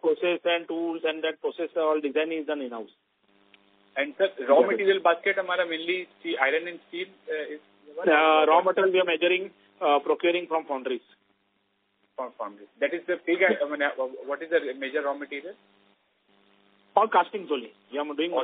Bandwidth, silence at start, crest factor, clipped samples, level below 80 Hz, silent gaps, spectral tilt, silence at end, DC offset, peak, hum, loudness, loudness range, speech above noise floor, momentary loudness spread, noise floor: 4.5 kHz; 0.05 s; 22 dB; under 0.1%; -82 dBFS; none; -0.5 dB/octave; 0 s; under 0.1%; -4 dBFS; none; -26 LUFS; 7 LU; 46 dB; 15 LU; -72 dBFS